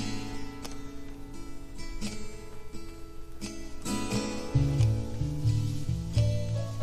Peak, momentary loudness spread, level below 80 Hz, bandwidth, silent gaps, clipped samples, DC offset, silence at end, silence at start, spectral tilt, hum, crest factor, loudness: -14 dBFS; 17 LU; -40 dBFS; 14.5 kHz; none; under 0.1%; under 0.1%; 0 s; 0 s; -6 dB/octave; none; 16 dB; -32 LUFS